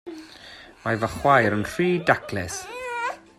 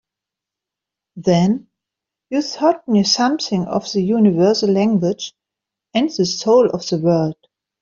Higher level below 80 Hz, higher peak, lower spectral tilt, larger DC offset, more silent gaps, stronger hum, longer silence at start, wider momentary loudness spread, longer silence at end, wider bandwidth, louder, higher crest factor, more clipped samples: first, -52 dBFS vs -58 dBFS; about the same, -4 dBFS vs -2 dBFS; about the same, -5 dB/octave vs -5.5 dB/octave; neither; neither; neither; second, 0.05 s vs 1.15 s; first, 22 LU vs 9 LU; second, 0.2 s vs 0.5 s; first, 16 kHz vs 7.4 kHz; second, -23 LUFS vs -17 LUFS; about the same, 20 dB vs 16 dB; neither